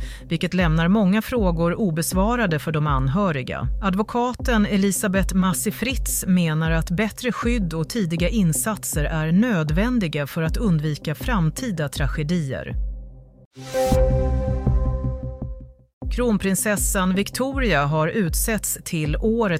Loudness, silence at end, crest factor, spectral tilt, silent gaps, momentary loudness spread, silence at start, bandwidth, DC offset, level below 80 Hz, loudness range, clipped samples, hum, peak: -22 LUFS; 0 s; 16 dB; -5.5 dB/octave; 13.46-13.51 s, 15.93-16.01 s; 7 LU; 0 s; 16 kHz; under 0.1%; -30 dBFS; 3 LU; under 0.1%; none; -6 dBFS